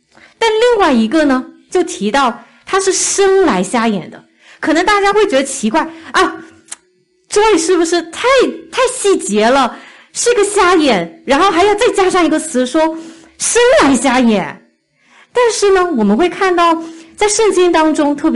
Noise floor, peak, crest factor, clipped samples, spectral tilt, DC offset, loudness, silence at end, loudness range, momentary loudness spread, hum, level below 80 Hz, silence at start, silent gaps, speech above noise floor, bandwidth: -57 dBFS; -2 dBFS; 10 dB; under 0.1%; -3 dB/octave; under 0.1%; -12 LUFS; 0 s; 2 LU; 8 LU; none; -42 dBFS; 0.4 s; none; 45 dB; 11.5 kHz